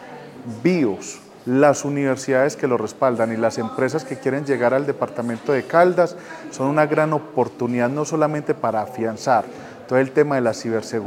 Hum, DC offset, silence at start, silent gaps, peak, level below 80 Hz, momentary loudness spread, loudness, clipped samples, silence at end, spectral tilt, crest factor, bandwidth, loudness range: none; under 0.1%; 0 s; none; -2 dBFS; -68 dBFS; 9 LU; -20 LUFS; under 0.1%; 0 s; -6 dB/octave; 18 dB; 16.5 kHz; 2 LU